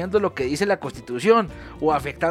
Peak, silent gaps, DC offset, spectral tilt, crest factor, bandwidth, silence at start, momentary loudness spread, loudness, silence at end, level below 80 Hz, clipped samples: -4 dBFS; none; under 0.1%; -5.5 dB/octave; 18 dB; 14 kHz; 0 s; 8 LU; -22 LUFS; 0 s; -46 dBFS; under 0.1%